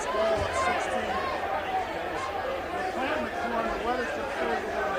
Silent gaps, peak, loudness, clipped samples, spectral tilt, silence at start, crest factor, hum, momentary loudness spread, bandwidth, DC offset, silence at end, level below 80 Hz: none; -14 dBFS; -29 LUFS; under 0.1%; -4 dB/octave; 0 s; 14 dB; none; 5 LU; 15.5 kHz; under 0.1%; 0 s; -50 dBFS